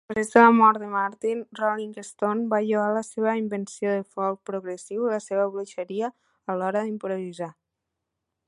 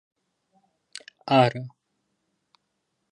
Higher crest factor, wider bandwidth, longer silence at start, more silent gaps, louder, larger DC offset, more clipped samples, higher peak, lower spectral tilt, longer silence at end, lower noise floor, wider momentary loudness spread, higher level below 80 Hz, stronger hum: about the same, 24 dB vs 24 dB; about the same, 11.5 kHz vs 11 kHz; second, 0.1 s vs 1.25 s; neither; second, -25 LUFS vs -22 LUFS; neither; neither; first, -2 dBFS vs -6 dBFS; about the same, -6 dB/octave vs -6.5 dB/octave; second, 0.95 s vs 1.45 s; first, -83 dBFS vs -77 dBFS; second, 15 LU vs 23 LU; about the same, -70 dBFS vs -72 dBFS; neither